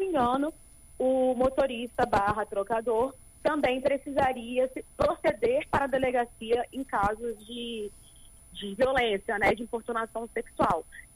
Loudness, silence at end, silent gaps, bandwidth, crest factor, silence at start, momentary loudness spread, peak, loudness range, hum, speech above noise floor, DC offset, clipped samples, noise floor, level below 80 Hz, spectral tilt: -29 LUFS; 0.1 s; none; 15.5 kHz; 16 dB; 0 s; 10 LU; -14 dBFS; 3 LU; none; 24 dB; under 0.1%; under 0.1%; -53 dBFS; -50 dBFS; -5 dB/octave